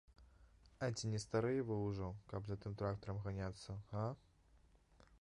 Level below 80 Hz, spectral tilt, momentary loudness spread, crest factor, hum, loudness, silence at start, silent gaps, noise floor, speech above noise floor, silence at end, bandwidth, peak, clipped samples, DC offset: -62 dBFS; -6.5 dB/octave; 8 LU; 18 dB; none; -44 LUFS; 0.1 s; none; -70 dBFS; 27 dB; 0.05 s; 11 kHz; -26 dBFS; under 0.1%; under 0.1%